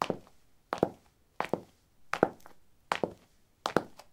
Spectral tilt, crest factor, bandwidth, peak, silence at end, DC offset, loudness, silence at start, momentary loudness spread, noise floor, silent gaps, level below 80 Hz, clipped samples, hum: -5 dB/octave; 30 dB; 17 kHz; -6 dBFS; 0.2 s; under 0.1%; -35 LUFS; 0 s; 9 LU; -64 dBFS; none; -68 dBFS; under 0.1%; none